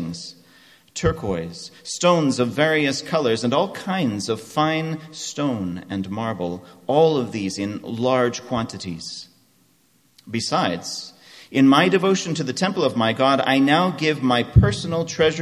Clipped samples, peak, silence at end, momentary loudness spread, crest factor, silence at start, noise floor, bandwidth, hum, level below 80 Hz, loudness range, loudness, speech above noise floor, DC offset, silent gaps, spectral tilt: under 0.1%; 0 dBFS; 0 s; 13 LU; 20 dB; 0 s; -60 dBFS; 13.5 kHz; none; -40 dBFS; 7 LU; -21 LUFS; 40 dB; under 0.1%; none; -5 dB/octave